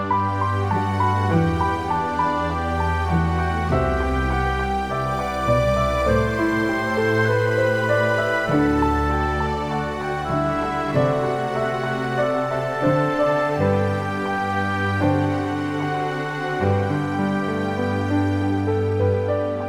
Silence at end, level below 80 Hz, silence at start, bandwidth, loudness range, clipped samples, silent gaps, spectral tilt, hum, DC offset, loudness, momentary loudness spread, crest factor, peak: 0 s; -34 dBFS; 0 s; 14 kHz; 3 LU; under 0.1%; none; -7 dB/octave; none; 0.2%; -21 LUFS; 5 LU; 14 dB; -6 dBFS